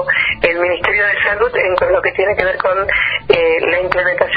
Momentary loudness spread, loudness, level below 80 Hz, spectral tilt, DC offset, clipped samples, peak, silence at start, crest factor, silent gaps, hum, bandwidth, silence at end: 2 LU; -14 LUFS; -40 dBFS; -6.5 dB/octave; under 0.1%; under 0.1%; 0 dBFS; 0 s; 14 dB; none; none; 6 kHz; 0 s